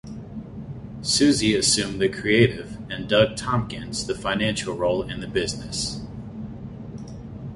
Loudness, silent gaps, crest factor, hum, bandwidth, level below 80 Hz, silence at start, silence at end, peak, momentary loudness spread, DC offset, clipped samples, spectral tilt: -22 LUFS; none; 20 dB; none; 11.5 kHz; -46 dBFS; 0.05 s; 0 s; -4 dBFS; 18 LU; under 0.1%; under 0.1%; -4 dB/octave